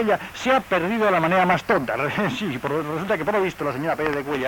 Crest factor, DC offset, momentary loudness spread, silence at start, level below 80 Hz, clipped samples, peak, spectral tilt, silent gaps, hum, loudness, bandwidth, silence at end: 16 dB; under 0.1%; 7 LU; 0 s; -52 dBFS; under 0.1%; -6 dBFS; -5.5 dB/octave; none; none; -22 LUFS; 19 kHz; 0 s